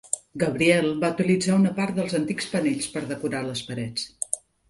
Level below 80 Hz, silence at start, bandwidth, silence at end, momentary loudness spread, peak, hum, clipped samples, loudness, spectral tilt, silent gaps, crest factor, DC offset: -60 dBFS; 0.05 s; 11.5 kHz; 0.3 s; 10 LU; -4 dBFS; none; under 0.1%; -25 LUFS; -4.5 dB/octave; none; 20 dB; under 0.1%